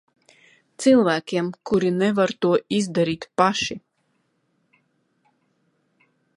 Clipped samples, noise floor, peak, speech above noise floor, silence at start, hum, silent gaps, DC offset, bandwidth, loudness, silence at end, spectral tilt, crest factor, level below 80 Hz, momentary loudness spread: under 0.1%; -70 dBFS; -2 dBFS; 49 dB; 0.8 s; none; none; under 0.1%; 11.5 kHz; -21 LUFS; 2.6 s; -5 dB/octave; 22 dB; -62 dBFS; 9 LU